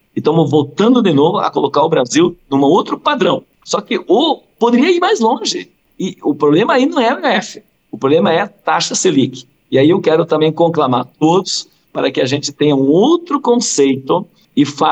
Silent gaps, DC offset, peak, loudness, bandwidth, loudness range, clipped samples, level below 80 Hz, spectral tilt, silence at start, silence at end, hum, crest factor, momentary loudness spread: none; under 0.1%; -2 dBFS; -14 LUFS; 9 kHz; 2 LU; under 0.1%; -62 dBFS; -4.5 dB/octave; 0.15 s; 0 s; none; 12 dB; 8 LU